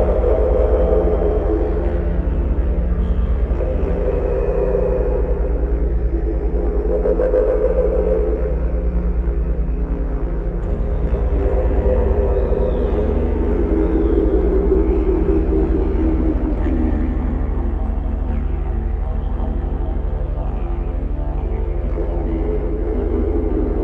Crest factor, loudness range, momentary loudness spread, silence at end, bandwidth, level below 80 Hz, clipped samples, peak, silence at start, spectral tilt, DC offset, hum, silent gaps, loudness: 14 dB; 6 LU; 7 LU; 0 s; 3.5 kHz; -20 dBFS; under 0.1%; -4 dBFS; 0 s; -11 dB/octave; under 0.1%; 50 Hz at -25 dBFS; none; -20 LUFS